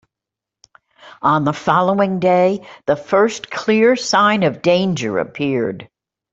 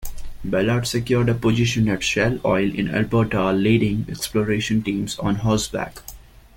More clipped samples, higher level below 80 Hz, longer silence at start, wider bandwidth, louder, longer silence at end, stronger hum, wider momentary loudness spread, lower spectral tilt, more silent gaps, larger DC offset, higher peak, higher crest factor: neither; second, -58 dBFS vs -40 dBFS; first, 1.05 s vs 0 s; second, 8 kHz vs 17 kHz; first, -16 LUFS vs -21 LUFS; about the same, 0.45 s vs 0.4 s; neither; about the same, 8 LU vs 8 LU; about the same, -5.5 dB/octave vs -5.5 dB/octave; neither; neither; about the same, -2 dBFS vs -4 dBFS; about the same, 16 dB vs 16 dB